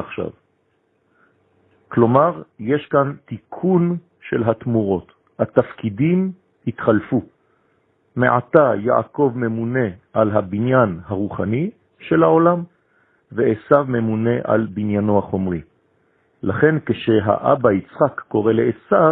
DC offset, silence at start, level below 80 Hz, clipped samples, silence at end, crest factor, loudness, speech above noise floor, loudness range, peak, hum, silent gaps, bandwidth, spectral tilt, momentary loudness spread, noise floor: under 0.1%; 0 s; -54 dBFS; under 0.1%; 0 s; 18 dB; -19 LUFS; 47 dB; 3 LU; 0 dBFS; none; none; 4 kHz; -11.5 dB/octave; 11 LU; -65 dBFS